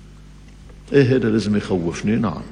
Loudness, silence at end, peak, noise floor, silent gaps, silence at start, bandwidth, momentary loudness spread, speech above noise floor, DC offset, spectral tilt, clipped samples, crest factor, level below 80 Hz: -19 LUFS; 0 s; -2 dBFS; -42 dBFS; none; 0 s; 10.5 kHz; 6 LU; 24 dB; under 0.1%; -7 dB/octave; under 0.1%; 18 dB; -42 dBFS